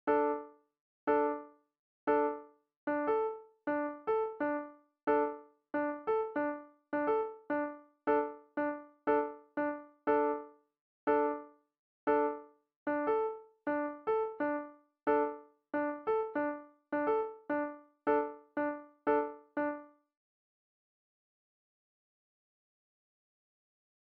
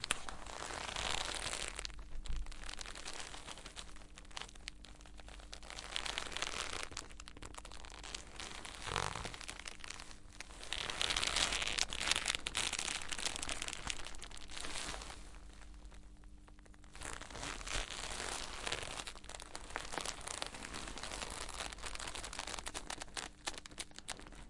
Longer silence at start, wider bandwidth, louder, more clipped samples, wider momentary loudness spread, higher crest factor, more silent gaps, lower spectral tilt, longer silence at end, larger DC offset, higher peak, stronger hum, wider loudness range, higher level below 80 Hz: about the same, 0.05 s vs 0 s; second, 4.6 kHz vs 11.5 kHz; first, -35 LUFS vs -41 LUFS; neither; second, 10 LU vs 17 LU; second, 18 dB vs 34 dB; first, 0.80-1.07 s, 1.79-2.07 s, 2.76-2.87 s, 5.03-5.07 s, 10.81-11.07 s, 11.79-12.07 s, 12.76-12.86 s vs none; first, -4 dB/octave vs -1 dB/octave; first, 4.15 s vs 0 s; neither; second, -18 dBFS vs -10 dBFS; neither; second, 2 LU vs 11 LU; second, -76 dBFS vs -52 dBFS